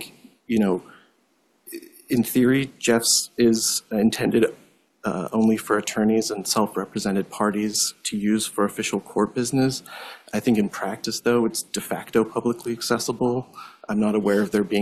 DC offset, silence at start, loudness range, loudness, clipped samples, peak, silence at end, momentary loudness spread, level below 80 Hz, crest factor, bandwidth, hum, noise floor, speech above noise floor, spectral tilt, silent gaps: under 0.1%; 0 s; 3 LU; -23 LUFS; under 0.1%; -6 dBFS; 0 s; 10 LU; -58 dBFS; 18 dB; 14.5 kHz; none; -65 dBFS; 42 dB; -4 dB/octave; none